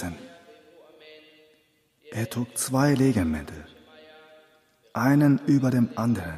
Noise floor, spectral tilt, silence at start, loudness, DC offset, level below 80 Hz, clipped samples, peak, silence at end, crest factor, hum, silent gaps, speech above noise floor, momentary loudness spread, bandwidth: -66 dBFS; -6.5 dB/octave; 0 s; -24 LUFS; under 0.1%; -52 dBFS; under 0.1%; -8 dBFS; 0 s; 18 dB; none; none; 43 dB; 17 LU; 15.5 kHz